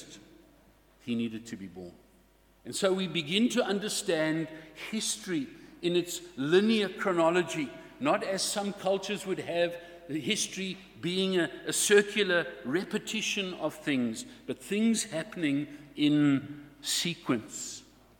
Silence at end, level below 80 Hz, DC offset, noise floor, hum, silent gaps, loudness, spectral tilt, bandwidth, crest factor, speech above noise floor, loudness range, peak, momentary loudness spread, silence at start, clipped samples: 0.4 s; -68 dBFS; under 0.1%; -62 dBFS; none; none; -30 LUFS; -3.5 dB/octave; 19 kHz; 22 dB; 32 dB; 3 LU; -10 dBFS; 14 LU; 0 s; under 0.1%